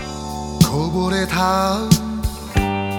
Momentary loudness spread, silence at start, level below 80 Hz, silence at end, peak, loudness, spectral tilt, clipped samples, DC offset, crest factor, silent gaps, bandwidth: 10 LU; 0 s; -30 dBFS; 0 s; 0 dBFS; -19 LUFS; -5 dB/octave; under 0.1%; under 0.1%; 18 dB; none; 19 kHz